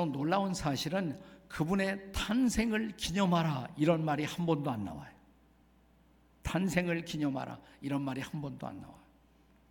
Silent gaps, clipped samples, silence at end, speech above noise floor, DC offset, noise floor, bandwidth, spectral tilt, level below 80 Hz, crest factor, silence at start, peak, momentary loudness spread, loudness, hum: none; under 0.1%; 0.7 s; 32 dB; under 0.1%; -65 dBFS; 18 kHz; -5.5 dB/octave; -54 dBFS; 18 dB; 0 s; -16 dBFS; 15 LU; -33 LUFS; none